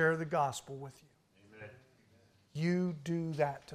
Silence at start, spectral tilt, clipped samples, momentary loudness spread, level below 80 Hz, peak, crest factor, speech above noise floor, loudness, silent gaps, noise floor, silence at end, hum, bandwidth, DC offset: 0 s; -6.5 dB/octave; under 0.1%; 20 LU; -74 dBFS; -18 dBFS; 18 dB; 32 dB; -35 LUFS; none; -67 dBFS; 0 s; none; 14.5 kHz; under 0.1%